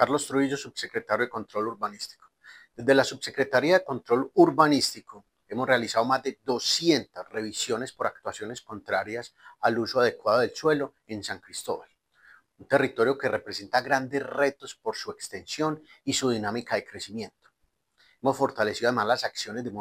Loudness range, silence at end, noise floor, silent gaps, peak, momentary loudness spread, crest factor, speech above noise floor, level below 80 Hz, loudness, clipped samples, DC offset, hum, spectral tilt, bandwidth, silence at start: 6 LU; 0 s; -74 dBFS; none; -4 dBFS; 14 LU; 22 dB; 47 dB; -70 dBFS; -27 LUFS; under 0.1%; under 0.1%; none; -4 dB/octave; 16 kHz; 0 s